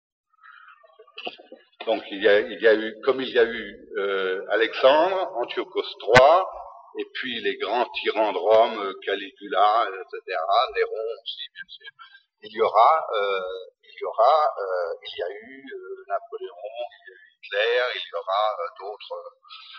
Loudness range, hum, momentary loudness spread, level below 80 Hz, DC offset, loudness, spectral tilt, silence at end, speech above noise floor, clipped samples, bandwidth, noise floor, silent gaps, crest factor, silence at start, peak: 7 LU; none; 19 LU; -60 dBFS; under 0.1%; -23 LUFS; -4.5 dB/octave; 0 s; 28 dB; under 0.1%; 8.2 kHz; -52 dBFS; none; 24 dB; 1 s; 0 dBFS